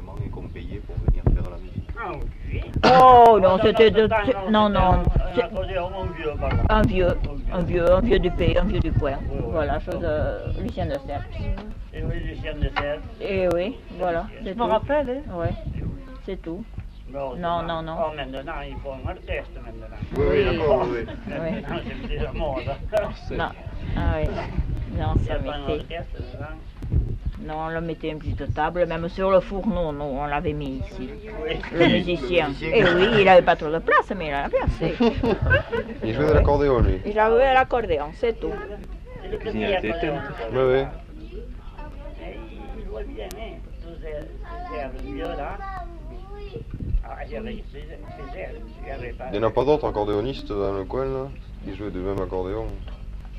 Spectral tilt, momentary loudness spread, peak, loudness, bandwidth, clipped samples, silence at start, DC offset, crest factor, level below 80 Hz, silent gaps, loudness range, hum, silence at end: -7.5 dB/octave; 19 LU; -2 dBFS; -23 LUFS; 9.8 kHz; under 0.1%; 0 s; under 0.1%; 20 dB; -32 dBFS; none; 15 LU; none; 0 s